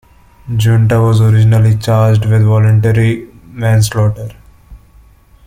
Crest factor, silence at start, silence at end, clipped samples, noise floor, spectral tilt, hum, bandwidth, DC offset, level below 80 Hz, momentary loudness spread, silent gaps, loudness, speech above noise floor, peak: 10 dB; 0.45 s; 0.7 s; under 0.1%; -43 dBFS; -7 dB/octave; none; 15.5 kHz; under 0.1%; -38 dBFS; 11 LU; none; -11 LUFS; 34 dB; -2 dBFS